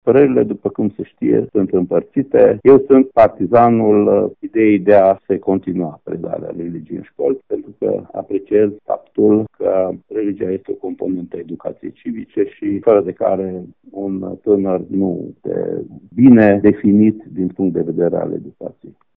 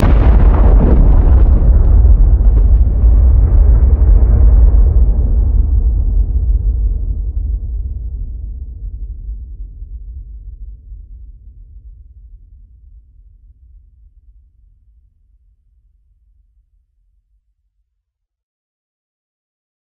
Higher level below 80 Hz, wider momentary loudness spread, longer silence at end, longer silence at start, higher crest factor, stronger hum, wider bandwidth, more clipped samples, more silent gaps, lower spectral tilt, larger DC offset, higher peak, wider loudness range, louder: second, -54 dBFS vs -12 dBFS; second, 16 LU vs 21 LU; second, 0.25 s vs 7.45 s; about the same, 0.05 s vs 0 s; about the same, 16 dB vs 12 dB; neither; first, 4 kHz vs 2.6 kHz; neither; neither; about the same, -11.5 dB/octave vs -10.5 dB/octave; neither; about the same, 0 dBFS vs 0 dBFS; second, 8 LU vs 22 LU; about the same, -15 LUFS vs -13 LUFS